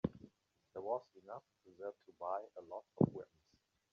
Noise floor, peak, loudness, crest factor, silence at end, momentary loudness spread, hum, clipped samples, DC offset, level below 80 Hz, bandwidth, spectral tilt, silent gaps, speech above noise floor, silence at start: -79 dBFS; -16 dBFS; -43 LUFS; 28 dB; 0.7 s; 18 LU; none; under 0.1%; under 0.1%; -72 dBFS; 6.8 kHz; -10 dB/octave; none; 36 dB; 0.05 s